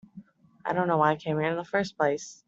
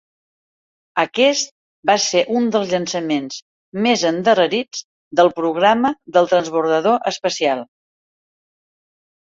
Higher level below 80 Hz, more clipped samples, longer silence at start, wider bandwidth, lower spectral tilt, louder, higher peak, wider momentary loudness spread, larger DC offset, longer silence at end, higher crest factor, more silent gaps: about the same, -68 dBFS vs -66 dBFS; neither; second, 0.15 s vs 0.95 s; about the same, 8 kHz vs 7.8 kHz; first, -6 dB/octave vs -3.5 dB/octave; second, -27 LUFS vs -18 LUFS; second, -8 dBFS vs -2 dBFS; second, 6 LU vs 10 LU; neither; second, 0.15 s vs 1.55 s; about the same, 20 dB vs 18 dB; second, none vs 1.51-1.83 s, 3.42-3.72 s, 4.84-5.11 s